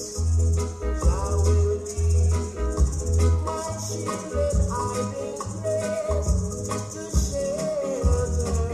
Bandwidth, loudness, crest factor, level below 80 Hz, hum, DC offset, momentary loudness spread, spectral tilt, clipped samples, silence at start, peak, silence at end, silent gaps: 12.5 kHz; -25 LUFS; 14 dB; -28 dBFS; none; under 0.1%; 7 LU; -6 dB/octave; under 0.1%; 0 s; -8 dBFS; 0 s; none